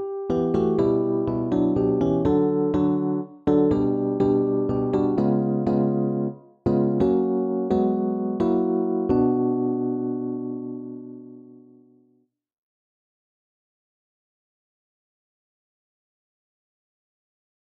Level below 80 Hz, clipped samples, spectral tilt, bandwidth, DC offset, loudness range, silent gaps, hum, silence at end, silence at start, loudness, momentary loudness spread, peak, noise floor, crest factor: -50 dBFS; under 0.1%; -10.5 dB/octave; 6.8 kHz; under 0.1%; 9 LU; none; none; 6.2 s; 0 s; -23 LUFS; 8 LU; -8 dBFS; -65 dBFS; 16 dB